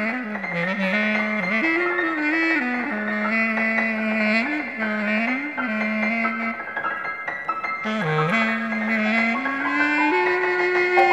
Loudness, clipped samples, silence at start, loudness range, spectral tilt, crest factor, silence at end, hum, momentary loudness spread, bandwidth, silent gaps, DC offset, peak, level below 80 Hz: -22 LUFS; under 0.1%; 0 s; 3 LU; -6 dB/octave; 18 dB; 0 s; none; 7 LU; 9.2 kHz; none; 0.1%; -4 dBFS; -70 dBFS